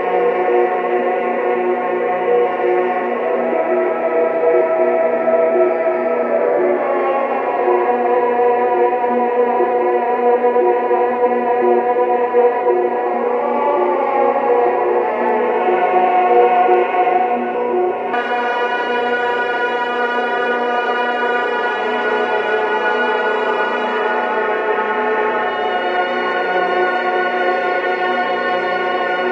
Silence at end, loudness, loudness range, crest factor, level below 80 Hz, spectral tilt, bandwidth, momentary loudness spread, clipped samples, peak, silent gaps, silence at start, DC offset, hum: 0 s; -16 LUFS; 3 LU; 14 dB; -68 dBFS; -5.5 dB/octave; 6.6 kHz; 4 LU; under 0.1%; -2 dBFS; none; 0 s; under 0.1%; none